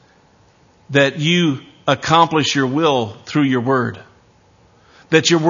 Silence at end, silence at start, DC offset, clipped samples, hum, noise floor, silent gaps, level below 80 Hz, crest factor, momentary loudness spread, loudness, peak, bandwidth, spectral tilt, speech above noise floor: 0 s; 0.9 s; under 0.1%; under 0.1%; none; -52 dBFS; none; -56 dBFS; 18 dB; 8 LU; -16 LUFS; 0 dBFS; 7.4 kHz; -4.5 dB/octave; 37 dB